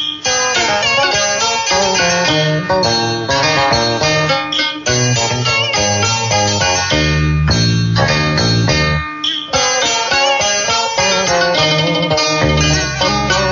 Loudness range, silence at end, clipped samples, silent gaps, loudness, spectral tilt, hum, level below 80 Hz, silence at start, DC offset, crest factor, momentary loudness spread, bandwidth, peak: 1 LU; 0 s; under 0.1%; none; -13 LUFS; -3 dB/octave; none; -30 dBFS; 0 s; under 0.1%; 14 dB; 3 LU; 7.6 kHz; 0 dBFS